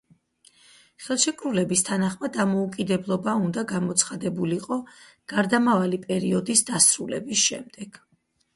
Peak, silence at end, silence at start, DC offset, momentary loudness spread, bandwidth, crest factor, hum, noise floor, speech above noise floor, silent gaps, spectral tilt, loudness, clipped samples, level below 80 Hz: -4 dBFS; 0.65 s; 1 s; under 0.1%; 12 LU; 11.5 kHz; 22 dB; none; -59 dBFS; 35 dB; none; -3.5 dB/octave; -23 LUFS; under 0.1%; -64 dBFS